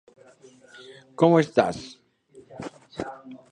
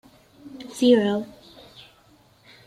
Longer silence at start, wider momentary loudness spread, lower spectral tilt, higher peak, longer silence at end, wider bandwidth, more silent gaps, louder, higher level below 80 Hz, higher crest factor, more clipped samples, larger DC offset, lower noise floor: first, 1.2 s vs 0.45 s; about the same, 25 LU vs 26 LU; first, -7 dB/octave vs -5.5 dB/octave; about the same, -4 dBFS vs -6 dBFS; second, 0.15 s vs 1.4 s; second, 10 kHz vs 14 kHz; neither; about the same, -23 LUFS vs -21 LUFS; about the same, -62 dBFS vs -66 dBFS; about the same, 24 dB vs 20 dB; neither; neither; about the same, -54 dBFS vs -57 dBFS